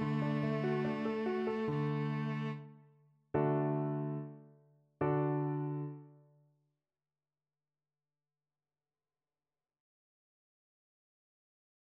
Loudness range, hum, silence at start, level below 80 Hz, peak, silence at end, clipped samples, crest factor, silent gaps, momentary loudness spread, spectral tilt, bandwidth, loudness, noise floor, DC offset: 6 LU; none; 0 s; -74 dBFS; -20 dBFS; 5.85 s; under 0.1%; 18 dB; none; 10 LU; -9.5 dB/octave; 5.8 kHz; -36 LUFS; under -90 dBFS; under 0.1%